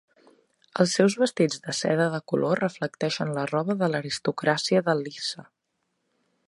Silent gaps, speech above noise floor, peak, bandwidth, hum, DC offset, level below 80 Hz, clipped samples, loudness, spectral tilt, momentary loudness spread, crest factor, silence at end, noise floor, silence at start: none; 52 dB; -6 dBFS; 11.5 kHz; none; under 0.1%; -72 dBFS; under 0.1%; -25 LUFS; -5 dB/octave; 8 LU; 20 dB; 1.05 s; -77 dBFS; 0.75 s